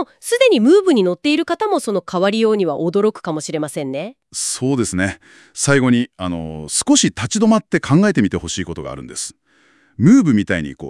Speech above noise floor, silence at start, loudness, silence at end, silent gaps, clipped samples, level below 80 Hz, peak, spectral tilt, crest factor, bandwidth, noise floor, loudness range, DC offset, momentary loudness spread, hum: 39 dB; 0 s; -17 LUFS; 0 s; none; under 0.1%; -50 dBFS; 0 dBFS; -4.5 dB/octave; 16 dB; 12 kHz; -55 dBFS; 4 LU; under 0.1%; 14 LU; none